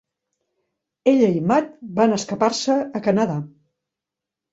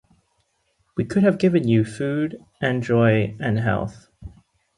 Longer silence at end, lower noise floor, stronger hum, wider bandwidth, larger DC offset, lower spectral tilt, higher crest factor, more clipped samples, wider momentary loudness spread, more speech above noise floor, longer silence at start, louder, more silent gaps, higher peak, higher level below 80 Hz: first, 1.05 s vs 0.5 s; first, -86 dBFS vs -68 dBFS; neither; second, 8 kHz vs 11.5 kHz; neither; second, -5.5 dB/octave vs -8 dB/octave; about the same, 18 dB vs 18 dB; neither; second, 8 LU vs 11 LU; first, 67 dB vs 48 dB; about the same, 1.05 s vs 0.95 s; about the same, -20 LUFS vs -21 LUFS; neither; about the same, -4 dBFS vs -6 dBFS; second, -64 dBFS vs -50 dBFS